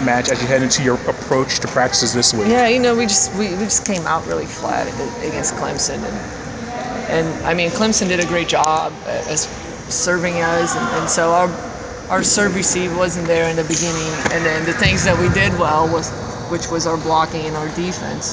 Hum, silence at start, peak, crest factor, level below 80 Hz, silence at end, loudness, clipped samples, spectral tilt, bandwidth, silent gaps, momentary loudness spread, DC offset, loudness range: none; 0 s; 0 dBFS; 18 dB; -38 dBFS; 0 s; -17 LUFS; under 0.1%; -3.5 dB/octave; 8 kHz; none; 10 LU; under 0.1%; 5 LU